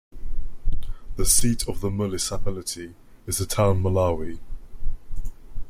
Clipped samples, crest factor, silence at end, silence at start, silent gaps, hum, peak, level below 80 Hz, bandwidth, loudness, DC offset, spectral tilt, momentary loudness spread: under 0.1%; 18 dB; 0 s; 0.15 s; none; none; -4 dBFS; -30 dBFS; 15.5 kHz; -25 LUFS; under 0.1%; -4.5 dB/octave; 21 LU